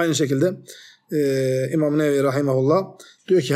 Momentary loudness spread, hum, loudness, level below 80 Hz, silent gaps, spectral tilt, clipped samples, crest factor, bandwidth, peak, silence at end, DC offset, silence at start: 5 LU; none; -21 LUFS; -68 dBFS; none; -6 dB/octave; under 0.1%; 14 dB; 15 kHz; -6 dBFS; 0 s; under 0.1%; 0 s